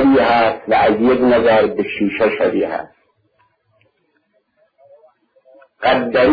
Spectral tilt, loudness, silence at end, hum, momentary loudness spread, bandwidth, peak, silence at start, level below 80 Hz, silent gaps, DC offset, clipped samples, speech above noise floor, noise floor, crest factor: -8 dB/octave; -15 LUFS; 0 s; none; 8 LU; 5 kHz; -4 dBFS; 0 s; -48 dBFS; none; under 0.1%; under 0.1%; 49 dB; -63 dBFS; 14 dB